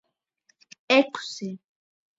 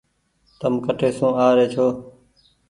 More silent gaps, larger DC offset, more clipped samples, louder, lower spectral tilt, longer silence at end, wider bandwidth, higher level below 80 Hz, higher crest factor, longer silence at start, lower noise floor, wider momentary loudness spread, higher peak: neither; neither; neither; second, -24 LUFS vs -20 LUFS; second, -4 dB/octave vs -7 dB/octave; about the same, 0.6 s vs 0.6 s; second, 8 kHz vs 11 kHz; second, -80 dBFS vs -58 dBFS; about the same, 22 dB vs 18 dB; first, 0.9 s vs 0.6 s; first, -69 dBFS vs -64 dBFS; first, 17 LU vs 9 LU; second, -6 dBFS vs -2 dBFS